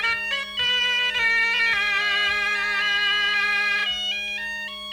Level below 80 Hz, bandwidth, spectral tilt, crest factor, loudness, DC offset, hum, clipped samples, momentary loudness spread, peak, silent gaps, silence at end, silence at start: -56 dBFS; over 20 kHz; 0 dB/octave; 12 dB; -21 LUFS; under 0.1%; none; under 0.1%; 7 LU; -10 dBFS; none; 0 s; 0 s